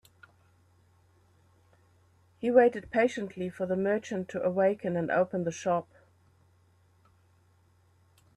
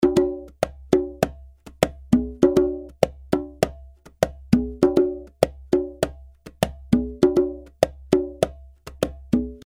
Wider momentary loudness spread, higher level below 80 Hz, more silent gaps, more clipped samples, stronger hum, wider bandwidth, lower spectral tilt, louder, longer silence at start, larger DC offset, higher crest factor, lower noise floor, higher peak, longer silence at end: first, 12 LU vs 9 LU; second, -70 dBFS vs -40 dBFS; neither; neither; neither; second, 11.5 kHz vs 17 kHz; about the same, -6.5 dB/octave vs -6.5 dB/octave; second, -29 LUFS vs -23 LUFS; first, 2.4 s vs 0 s; neither; about the same, 22 dB vs 22 dB; first, -65 dBFS vs -45 dBFS; second, -10 dBFS vs 0 dBFS; first, 2.55 s vs 0.1 s